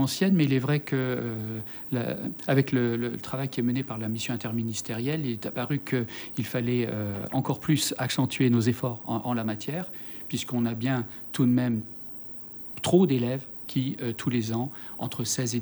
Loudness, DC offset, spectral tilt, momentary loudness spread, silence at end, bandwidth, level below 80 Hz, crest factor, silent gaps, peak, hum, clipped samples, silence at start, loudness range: -28 LUFS; under 0.1%; -5.5 dB/octave; 10 LU; 0 s; over 20 kHz; -64 dBFS; 20 dB; none; -8 dBFS; none; under 0.1%; 0 s; 3 LU